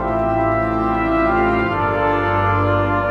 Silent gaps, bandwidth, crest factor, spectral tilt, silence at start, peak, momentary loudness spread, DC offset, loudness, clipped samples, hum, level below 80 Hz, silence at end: none; 6.6 kHz; 12 dB; -8.5 dB/octave; 0 s; -6 dBFS; 2 LU; under 0.1%; -17 LUFS; under 0.1%; none; -32 dBFS; 0 s